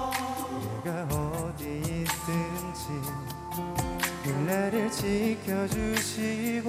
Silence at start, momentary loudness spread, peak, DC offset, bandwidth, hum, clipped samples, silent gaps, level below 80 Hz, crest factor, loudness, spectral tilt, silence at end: 0 s; 7 LU; -10 dBFS; under 0.1%; over 20 kHz; none; under 0.1%; none; -48 dBFS; 20 dB; -31 LUFS; -5 dB/octave; 0 s